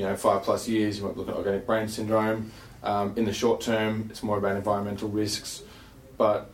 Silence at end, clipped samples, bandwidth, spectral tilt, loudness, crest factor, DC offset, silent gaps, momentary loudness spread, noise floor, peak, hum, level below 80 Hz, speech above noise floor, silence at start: 0 s; under 0.1%; 16.5 kHz; -5 dB/octave; -27 LUFS; 18 dB; under 0.1%; none; 8 LU; -48 dBFS; -10 dBFS; none; -54 dBFS; 21 dB; 0 s